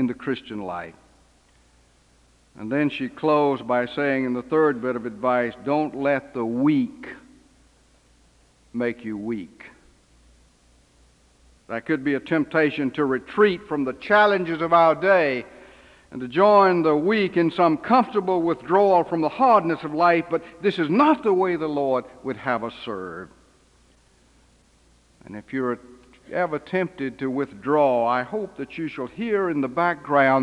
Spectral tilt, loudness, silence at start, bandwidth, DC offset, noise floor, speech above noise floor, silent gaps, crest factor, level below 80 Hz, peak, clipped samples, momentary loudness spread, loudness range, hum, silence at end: -7.5 dB/octave; -22 LUFS; 0 s; 10 kHz; under 0.1%; -58 dBFS; 36 dB; none; 18 dB; -60 dBFS; -4 dBFS; under 0.1%; 14 LU; 14 LU; none; 0 s